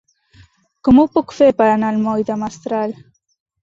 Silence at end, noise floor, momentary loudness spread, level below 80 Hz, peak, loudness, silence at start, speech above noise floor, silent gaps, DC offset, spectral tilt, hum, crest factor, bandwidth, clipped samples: 0.7 s; -50 dBFS; 11 LU; -48 dBFS; -2 dBFS; -16 LUFS; 0.85 s; 35 dB; none; under 0.1%; -7 dB/octave; none; 16 dB; 7.6 kHz; under 0.1%